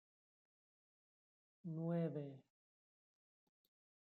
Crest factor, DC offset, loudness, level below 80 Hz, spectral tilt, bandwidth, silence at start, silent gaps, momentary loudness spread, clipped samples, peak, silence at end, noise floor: 20 dB; under 0.1%; -45 LUFS; under -90 dBFS; -10 dB/octave; 4.2 kHz; 1.65 s; none; 15 LU; under 0.1%; -32 dBFS; 1.65 s; under -90 dBFS